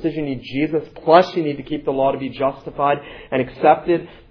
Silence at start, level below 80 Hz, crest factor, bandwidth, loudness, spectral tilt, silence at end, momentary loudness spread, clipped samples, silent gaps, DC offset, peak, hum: 0 s; -50 dBFS; 20 dB; 5.4 kHz; -19 LUFS; -7.5 dB/octave; 0.2 s; 11 LU; under 0.1%; none; under 0.1%; 0 dBFS; none